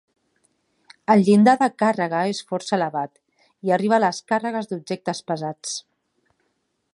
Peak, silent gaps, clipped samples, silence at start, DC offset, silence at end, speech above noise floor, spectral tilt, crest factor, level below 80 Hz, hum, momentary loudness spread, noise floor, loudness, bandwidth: -4 dBFS; none; under 0.1%; 1.1 s; under 0.1%; 1.15 s; 52 dB; -5.5 dB/octave; 20 dB; -72 dBFS; none; 15 LU; -72 dBFS; -21 LUFS; 11 kHz